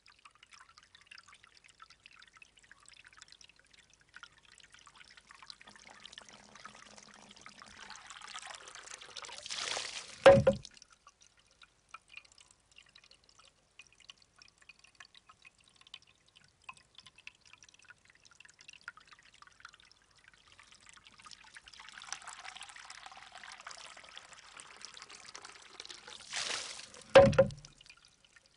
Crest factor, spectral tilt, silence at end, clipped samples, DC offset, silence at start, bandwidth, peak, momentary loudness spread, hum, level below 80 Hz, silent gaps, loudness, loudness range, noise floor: 30 dB; -4 dB/octave; 1 s; under 0.1%; under 0.1%; 7.9 s; 10.5 kHz; -8 dBFS; 26 LU; none; -64 dBFS; none; -30 LUFS; 26 LU; -67 dBFS